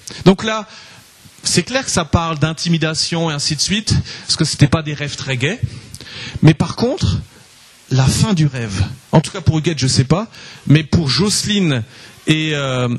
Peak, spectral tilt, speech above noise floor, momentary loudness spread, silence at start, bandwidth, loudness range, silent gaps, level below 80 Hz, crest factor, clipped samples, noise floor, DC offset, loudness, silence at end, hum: 0 dBFS; -4.5 dB/octave; 29 dB; 10 LU; 0.05 s; 12.5 kHz; 2 LU; none; -36 dBFS; 16 dB; under 0.1%; -45 dBFS; under 0.1%; -16 LUFS; 0 s; none